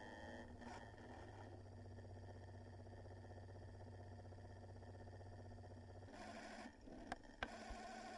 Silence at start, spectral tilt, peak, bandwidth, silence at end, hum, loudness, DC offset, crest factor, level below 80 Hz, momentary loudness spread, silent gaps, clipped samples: 0 s; -5.5 dB/octave; -32 dBFS; 11 kHz; 0 s; none; -57 LUFS; under 0.1%; 24 dB; -66 dBFS; 5 LU; none; under 0.1%